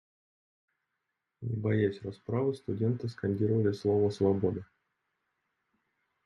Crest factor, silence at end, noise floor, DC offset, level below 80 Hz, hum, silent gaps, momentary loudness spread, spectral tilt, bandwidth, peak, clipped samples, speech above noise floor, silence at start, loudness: 18 dB; 1.6 s; -85 dBFS; under 0.1%; -70 dBFS; none; none; 9 LU; -9 dB/octave; 10.5 kHz; -16 dBFS; under 0.1%; 55 dB; 1.4 s; -31 LUFS